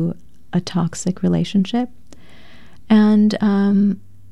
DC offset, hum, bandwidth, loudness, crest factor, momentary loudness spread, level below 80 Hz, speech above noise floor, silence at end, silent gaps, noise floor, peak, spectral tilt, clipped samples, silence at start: 2%; none; 10.5 kHz; -18 LUFS; 14 dB; 11 LU; -52 dBFS; 30 dB; 0.35 s; none; -47 dBFS; -4 dBFS; -7 dB/octave; under 0.1%; 0 s